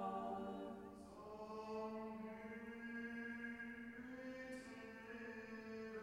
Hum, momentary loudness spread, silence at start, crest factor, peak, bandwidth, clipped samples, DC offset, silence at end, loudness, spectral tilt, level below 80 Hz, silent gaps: none; 7 LU; 0 s; 16 dB; -34 dBFS; 16 kHz; under 0.1%; under 0.1%; 0 s; -51 LUFS; -6 dB/octave; -76 dBFS; none